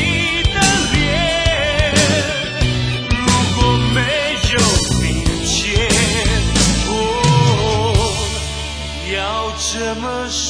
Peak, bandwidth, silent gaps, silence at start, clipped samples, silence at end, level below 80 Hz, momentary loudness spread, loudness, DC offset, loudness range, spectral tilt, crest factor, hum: 0 dBFS; 10.5 kHz; none; 0 s; under 0.1%; 0 s; -24 dBFS; 7 LU; -15 LUFS; under 0.1%; 2 LU; -3.5 dB/octave; 16 dB; none